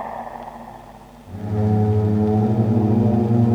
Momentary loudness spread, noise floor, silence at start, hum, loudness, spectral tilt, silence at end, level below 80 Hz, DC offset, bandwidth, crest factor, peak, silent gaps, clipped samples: 19 LU; -41 dBFS; 0 s; none; -19 LUFS; -10.5 dB/octave; 0 s; -46 dBFS; under 0.1%; 5.2 kHz; 12 dB; -6 dBFS; none; under 0.1%